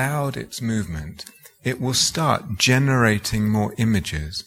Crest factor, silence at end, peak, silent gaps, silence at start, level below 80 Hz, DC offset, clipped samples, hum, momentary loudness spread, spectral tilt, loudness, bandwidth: 18 dB; 0.05 s; -2 dBFS; none; 0 s; -42 dBFS; under 0.1%; under 0.1%; none; 13 LU; -4.5 dB/octave; -21 LUFS; 16.5 kHz